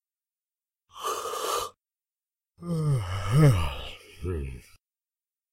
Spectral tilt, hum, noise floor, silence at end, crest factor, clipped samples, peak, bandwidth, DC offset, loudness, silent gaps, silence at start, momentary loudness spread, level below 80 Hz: -6 dB/octave; none; under -90 dBFS; 0.95 s; 20 dB; under 0.1%; -8 dBFS; 16 kHz; under 0.1%; -27 LUFS; none; 0.95 s; 19 LU; -44 dBFS